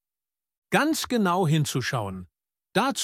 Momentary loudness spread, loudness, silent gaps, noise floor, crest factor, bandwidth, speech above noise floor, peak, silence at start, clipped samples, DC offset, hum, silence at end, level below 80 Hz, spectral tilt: 8 LU; -25 LUFS; none; under -90 dBFS; 20 dB; 16.5 kHz; over 66 dB; -6 dBFS; 0.7 s; under 0.1%; under 0.1%; none; 0 s; -62 dBFS; -4.5 dB/octave